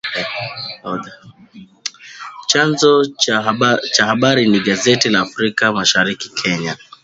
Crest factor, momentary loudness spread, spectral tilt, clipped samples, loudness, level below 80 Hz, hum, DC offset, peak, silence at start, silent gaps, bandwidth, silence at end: 16 dB; 15 LU; -3.5 dB/octave; under 0.1%; -15 LUFS; -56 dBFS; none; under 0.1%; 0 dBFS; 0.05 s; none; 8 kHz; 0.3 s